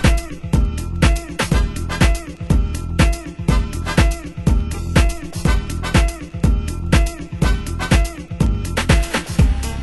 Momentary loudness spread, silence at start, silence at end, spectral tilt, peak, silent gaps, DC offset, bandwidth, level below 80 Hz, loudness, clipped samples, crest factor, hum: 5 LU; 0 s; 0 s; -5.5 dB/octave; 0 dBFS; none; under 0.1%; 12.5 kHz; -20 dBFS; -19 LUFS; under 0.1%; 18 dB; none